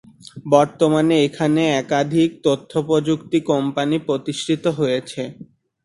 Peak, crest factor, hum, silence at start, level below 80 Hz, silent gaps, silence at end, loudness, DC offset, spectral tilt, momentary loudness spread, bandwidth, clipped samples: 0 dBFS; 18 dB; none; 0.35 s; -58 dBFS; none; 0.4 s; -19 LUFS; under 0.1%; -6 dB/octave; 7 LU; 11.5 kHz; under 0.1%